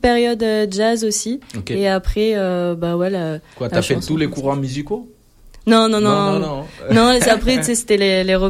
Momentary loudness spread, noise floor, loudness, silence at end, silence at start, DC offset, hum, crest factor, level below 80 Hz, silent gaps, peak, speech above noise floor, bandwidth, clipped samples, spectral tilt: 12 LU; -44 dBFS; -17 LUFS; 0 s; 0.05 s; under 0.1%; none; 14 dB; -34 dBFS; none; -2 dBFS; 27 dB; 15.5 kHz; under 0.1%; -4.5 dB/octave